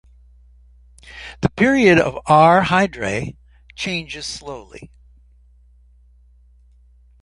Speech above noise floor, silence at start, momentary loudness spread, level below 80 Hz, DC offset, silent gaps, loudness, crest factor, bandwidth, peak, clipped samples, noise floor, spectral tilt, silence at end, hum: 34 dB; 1.1 s; 22 LU; -46 dBFS; under 0.1%; none; -17 LUFS; 18 dB; 11.5 kHz; -2 dBFS; under 0.1%; -51 dBFS; -5.5 dB/octave; 2.4 s; none